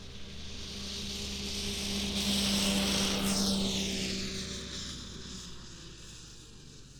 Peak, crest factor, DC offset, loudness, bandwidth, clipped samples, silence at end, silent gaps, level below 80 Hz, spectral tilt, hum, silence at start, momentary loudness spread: -16 dBFS; 18 dB; under 0.1%; -32 LUFS; over 20 kHz; under 0.1%; 0 s; none; -48 dBFS; -3 dB/octave; none; 0 s; 19 LU